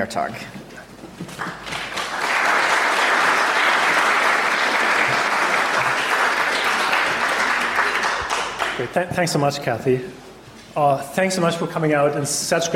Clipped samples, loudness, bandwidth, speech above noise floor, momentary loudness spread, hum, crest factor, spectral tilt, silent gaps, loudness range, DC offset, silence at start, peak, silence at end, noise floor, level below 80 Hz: under 0.1%; -19 LUFS; 16.5 kHz; 20 dB; 13 LU; none; 14 dB; -3 dB/octave; none; 5 LU; under 0.1%; 0 s; -6 dBFS; 0 s; -41 dBFS; -54 dBFS